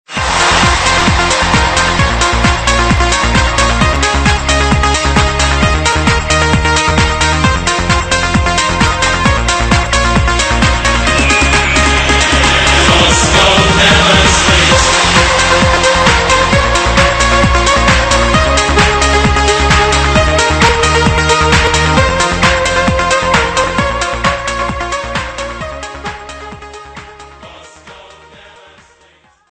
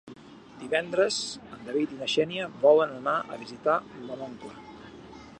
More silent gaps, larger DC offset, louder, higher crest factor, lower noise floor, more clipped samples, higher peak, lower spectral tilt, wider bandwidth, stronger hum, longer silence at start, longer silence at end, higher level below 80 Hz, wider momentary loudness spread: neither; neither; first, -9 LUFS vs -27 LUFS; second, 10 dB vs 20 dB; about the same, -48 dBFS vs -47 dBFS; neither; first, 0 dBFS vs -8 dBFS; about the same, -3.5 dB/octave vs -3.5 dB/octave; about the same, 10.5 kHz vs 10.5 kHz; neither; about the same, 0.1 s vs 0.05 s; first, 1.55 s vs 0 s; first, -18 dBFS vs -66 dBFS; second, 7 LU vs 24 LU